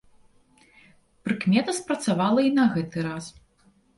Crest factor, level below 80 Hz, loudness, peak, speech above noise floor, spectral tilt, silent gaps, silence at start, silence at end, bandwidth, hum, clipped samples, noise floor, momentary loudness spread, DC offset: 18 dB; -62 dBFS; -24 LUFS; -8 dBFS; 38 dB; -5.5 dB/octave; none; 1.25 s; 0.65 s; 11.5 kHz; none; under 0.1%; -62 dBFS; 14 LU; under 0.1%